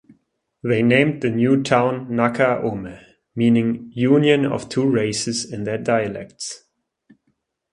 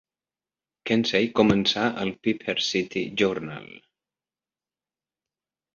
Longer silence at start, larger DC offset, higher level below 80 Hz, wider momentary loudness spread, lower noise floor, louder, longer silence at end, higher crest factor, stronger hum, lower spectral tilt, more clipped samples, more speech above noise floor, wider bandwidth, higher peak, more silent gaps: second, 0.65 s vs 0.85 s; neither; about the same, -56 dBFS vs -58 dBFS; about the same, 15 LU vs 13 LU; second, -70 dBFS vs under -90 dBFS; first, -19 LUFS vs -24 LUFS; second, 1.15 s vs 2 s; about the same, 20 dB vs 22 dB; neither; about the same, -5.5 dB/octave vs -5 dB/octave; neither; second, 51 dB vs over 66 dB; first, 11 kHz vs 7.4 kHz; first, 0 dBFS vs -6 dBFS; neither